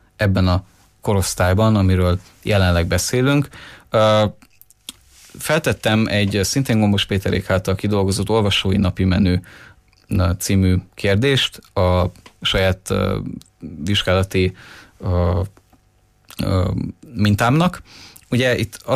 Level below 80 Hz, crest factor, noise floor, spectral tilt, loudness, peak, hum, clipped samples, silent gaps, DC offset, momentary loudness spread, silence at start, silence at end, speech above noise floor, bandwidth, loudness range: -38 dBFS; 14 dB; -57 dBFS; -5.5 dB/octave; -18 LUFS; -6 dBFS; none; under 0.1%; none; under 0.1%; 11 LU; 0.2 s; 0 s; 39 dB; 15.5 kHz; 4 LU